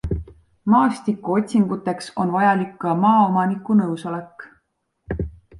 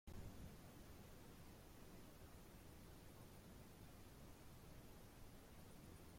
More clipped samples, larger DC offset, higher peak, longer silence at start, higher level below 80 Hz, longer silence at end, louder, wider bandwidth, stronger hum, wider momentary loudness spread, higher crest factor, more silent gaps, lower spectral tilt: neither; neither; first, -4 dBFS vs -44 dBFS; about the same, 0.05 s vs 0.05 s; first, -40 dBFS vs -66 dBFS; about the same, 0 s vs 0 s; first, -20 LUFS vs -63 LUFS; second, 11.5 kHz vs 16.5 kHz; neither; first, 13 LU vs 3 LU; about the same, 16 dB vs 16 dB; neither; first, -7.5 dB/octave vs -5 dB/octave